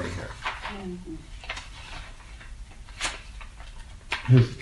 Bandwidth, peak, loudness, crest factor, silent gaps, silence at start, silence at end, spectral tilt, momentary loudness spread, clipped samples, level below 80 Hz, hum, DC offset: 11.5 kHz; -6 dBFS; -29 LUFS; 22 dB; none; 0 s; 0 s; -6 dB/octave; 23 LU; under 0.1%; -42 dBFS; none; under 0.1%